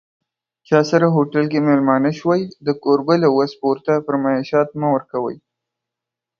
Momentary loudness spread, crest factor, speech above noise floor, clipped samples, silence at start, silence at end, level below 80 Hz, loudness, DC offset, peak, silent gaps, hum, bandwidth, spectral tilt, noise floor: 6 LU; 18 dB; 68 dB; under 0.1%; 0.7 s; 1.05 s; -64 dBFS; -18 LUFS; under 0.1%; 0 dBFS; none; none; 7 kHz; -7.5 dB/octave; -85 dBFS